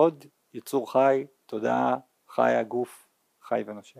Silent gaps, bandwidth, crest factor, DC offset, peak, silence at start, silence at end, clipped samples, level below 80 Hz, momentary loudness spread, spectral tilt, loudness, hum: none; 15.5 kHz; 20 dB; under 0.1%; -8 dBFS; 0 s; 0.2 s; under 0.1%; -84 dBFS; 14 LU; -6 dB/octave; -27 LUFS; none